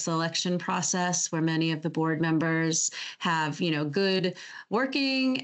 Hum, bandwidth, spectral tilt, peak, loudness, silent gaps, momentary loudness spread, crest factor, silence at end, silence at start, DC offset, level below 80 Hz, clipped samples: none; 8.2 kHz; -4 dB/octave; -14 dBFS; -27 LUFS; none; 4 LU; 14 dB; 0 s; 0 s; under 0.1%; -78 dBFS; under 0.1%